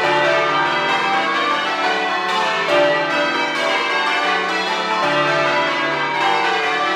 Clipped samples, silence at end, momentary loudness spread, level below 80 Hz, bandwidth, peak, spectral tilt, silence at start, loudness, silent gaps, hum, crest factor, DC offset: under 0.1%; 0 s; 3 LU; -64 dBFS; 13.5 kHz; -4 dBFS; -3 dB/octave; 0 s; -17 LUFS; none; none; 14 dB; under 0.1%